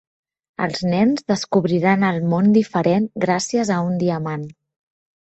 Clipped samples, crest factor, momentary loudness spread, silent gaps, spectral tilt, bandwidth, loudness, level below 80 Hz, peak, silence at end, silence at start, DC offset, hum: under 0.1%; 16 dB; 10 LU; none; -6 dB/octave; 8.4 kHz; -19 LUFS; -58 dBFS; -4 dBFS; 0.85 s; 0.6 s; under 0.1%; none